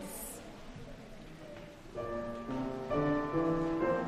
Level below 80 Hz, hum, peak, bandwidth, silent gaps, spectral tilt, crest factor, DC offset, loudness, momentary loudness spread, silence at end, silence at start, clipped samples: -52 dBFS; none; -20 dBFS; 15.5 kHz; none; -6 dB/octave; 16 dB; under 0.1%; -35 LUFS; 18 LU; 0 s; 0 s; under 0.1%